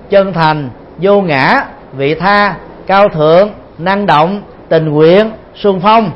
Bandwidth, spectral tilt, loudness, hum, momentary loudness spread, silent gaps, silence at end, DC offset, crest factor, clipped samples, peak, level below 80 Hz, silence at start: 6.6 kHz; -8 dB/octave; -10 LUFS; none; 10 LU; none; 0 s; under 0.1%; 10 dB; 0.2%; 0 dBFS; -42 dBFS; 0.05 s